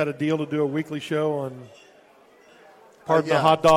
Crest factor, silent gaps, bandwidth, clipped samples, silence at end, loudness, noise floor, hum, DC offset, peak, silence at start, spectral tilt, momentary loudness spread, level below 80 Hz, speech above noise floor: 20 dB; none; 16 kHz; under 0.1%; 0 s; -23 LUFS; -54 dBFS; none; under 0.1%; -4 dBFS; 0 s; -6 dB/octave; 15 LU; -60 dBFS; 32 dB